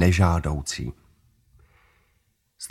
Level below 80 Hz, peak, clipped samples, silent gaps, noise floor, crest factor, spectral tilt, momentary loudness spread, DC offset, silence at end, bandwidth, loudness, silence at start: -38 dBFS; -4 dBFS; under 0.1%; none; -69 dBFS; 22 dB; -5.5 dB/octave; 17 LU; under 0.1%; 0.05 s; 13.5 kHz; -24 LUFS; 0 s